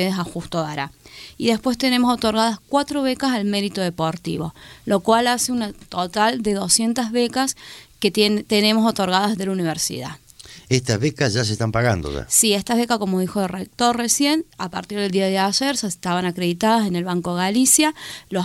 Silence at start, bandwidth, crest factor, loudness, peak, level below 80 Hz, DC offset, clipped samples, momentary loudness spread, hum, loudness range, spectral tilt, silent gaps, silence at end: 0 s; 16.5 kHz; 18 dB; -20 LUFS; -2 dBFS; -48 dBFS; under 0.1%; under 0.1%; 10 LU; none; 2 LU; -3.5 dB/octave; none; 0 s